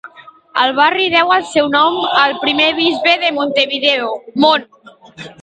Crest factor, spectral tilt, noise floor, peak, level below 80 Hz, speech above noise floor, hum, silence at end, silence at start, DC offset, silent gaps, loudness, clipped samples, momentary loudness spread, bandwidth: 14 dB; -3.5 dB/octave; -39 dBFS; 0 dBFS; -58 dBFS; 26 dB; none; 0.1 s; 0.05 s; under 0.1%; none; -13 LUFS; under 0.1%; 6 LU; 9.2 kHz